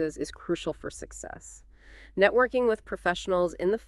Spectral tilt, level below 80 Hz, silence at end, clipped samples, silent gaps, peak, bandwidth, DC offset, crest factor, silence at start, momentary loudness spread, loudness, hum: -4.5 dB/octave; -52 dBFS; 0.1 s; under 0.1%; none; -6 dBFS; 12 kHz; under 0.1%; 22 dB; 0 s; 18 LU; -27 LUFS; none